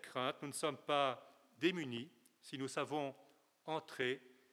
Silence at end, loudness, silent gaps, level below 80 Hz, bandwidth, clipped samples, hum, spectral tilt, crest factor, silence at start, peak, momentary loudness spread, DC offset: 0.2 s; -41 LUFS; none; under -90 dBFS; 16 kHz; under 0.1%; none; -4 dB/octave; 22 dB; 0.05 s; -20 dBFS; 15 LU; under 0.1%